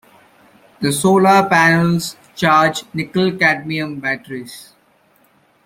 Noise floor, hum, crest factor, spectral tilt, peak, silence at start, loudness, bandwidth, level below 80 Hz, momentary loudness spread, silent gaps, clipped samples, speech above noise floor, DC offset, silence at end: -55 dBFS; none; 16 dB; -5 dB/octave; -2 dBFS; 0.8 s; -15 LUFS; 16.5 kHz; -56 dBFS; 13 LU; none; under 0.1%; 40 dB; under 0.1%; 1.05 s